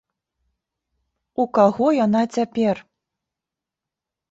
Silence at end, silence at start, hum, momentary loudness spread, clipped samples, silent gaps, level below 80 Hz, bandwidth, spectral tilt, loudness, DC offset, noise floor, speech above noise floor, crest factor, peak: 1.5 s; 1.4 s; none; 10 LU; under 0.1%; none; -64 dBFS; 8 kHz; -7 dB/octave; -20 LUFS; under 0.1%; -87 dBFS; 68 dB; 20 dB; -2 dBFS